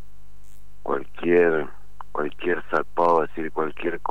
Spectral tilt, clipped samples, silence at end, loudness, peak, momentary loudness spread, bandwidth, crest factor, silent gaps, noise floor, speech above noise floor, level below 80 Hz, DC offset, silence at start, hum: -7 dB/octave; under 0.1%; 0.1 s; -24 LUFS; -8 dBFS; 11 LU; 8.2 kHz; 18 dB; none; -51 dBFS; 28 dB; -52 dBFS; 4%; 0.85 s; none